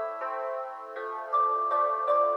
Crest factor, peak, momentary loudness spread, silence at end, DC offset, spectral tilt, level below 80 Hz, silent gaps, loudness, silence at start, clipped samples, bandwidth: 14 dB; -14 dBFS; 11 LU; 0 s; under 0.1%; -2.5 dB/octave; under -90 dBFS; none; -29 LUFS; 0 s; under 0.1%; 5.8 kHz